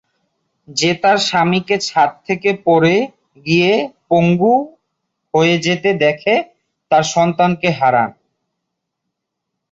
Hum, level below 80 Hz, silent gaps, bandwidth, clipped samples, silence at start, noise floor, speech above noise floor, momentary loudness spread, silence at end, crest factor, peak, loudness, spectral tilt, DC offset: none; -58 dBFS; none; 8 kHz; under 0.1%; 0.7 s; -77 dBFS; 63 dB; 6 LU; 1.6 s; 14 dB; -2 dBFS; -15 LUFS; -5 dB/octave; under 0.1%